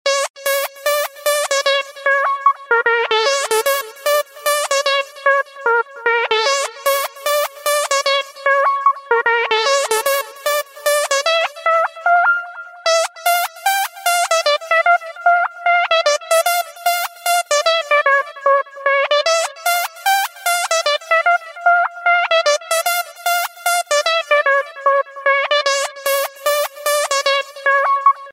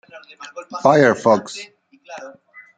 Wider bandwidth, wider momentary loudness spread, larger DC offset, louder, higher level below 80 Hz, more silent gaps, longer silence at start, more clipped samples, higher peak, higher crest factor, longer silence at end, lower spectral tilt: first, 16.5 kHz vs 9.2 kHz; second, 5 LU vs 25 LU; neither; about the same, -16 LUFS vs -15 LUFS; second, -76 dBFS vs -66 dBFS; first, 0.30-0.34 s vs none; about the same, 0.05 s vs 0.15 s; neither; about the same, -2 dBFS vs 0 dBFS; about the same, 16 dB vs 20 dB; second, 0 s vs 0.5 s; second, 3.5 dB/octave vs -5.5 dB/octave